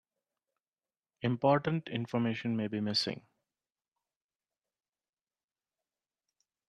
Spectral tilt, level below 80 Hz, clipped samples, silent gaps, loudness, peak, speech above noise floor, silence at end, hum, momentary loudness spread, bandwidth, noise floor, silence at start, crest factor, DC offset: -6 dB/octave; -76 dBFS; under 0.1%; none; -32 LUFS; -14 dBFS; over 58 dB; 3.5 s; none; 9 LU; 12 kHz; under -90 dBFS; 1.2 s; 22 dB; under 0.1%